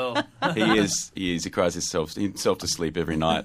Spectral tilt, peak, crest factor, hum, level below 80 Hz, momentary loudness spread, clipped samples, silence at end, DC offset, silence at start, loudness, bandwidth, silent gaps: -4 dB/octave; -6 dBFS; 18 dB; none; -50 dBFS; 7 LU; under 0.1%; 0 s; under 0.1%; 0 s; -25 LUFS; 15.5 kHz; none